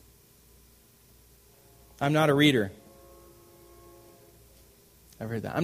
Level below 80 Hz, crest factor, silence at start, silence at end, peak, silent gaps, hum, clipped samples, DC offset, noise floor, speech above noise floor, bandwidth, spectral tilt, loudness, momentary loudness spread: -62 dBFS; 24 dB; 2 s; 0 s; -8 dBFS; none; none; under 0.1%; under 0.1%; -58 dBFS; 34 dB; 15.5 kHz; -5.5 dB/octave; -25 LUFS; 15 LU